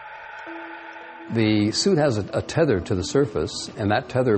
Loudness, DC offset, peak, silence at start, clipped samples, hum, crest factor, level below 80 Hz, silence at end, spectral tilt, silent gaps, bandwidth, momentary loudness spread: -22 LUFS; under 0.1%; -6 dBFS; 0 s; under 0.1%; none; 16 dB; -50 dBFS; 0 s; -5.5 dB/octave; none; 8.8 kHz; 17 LU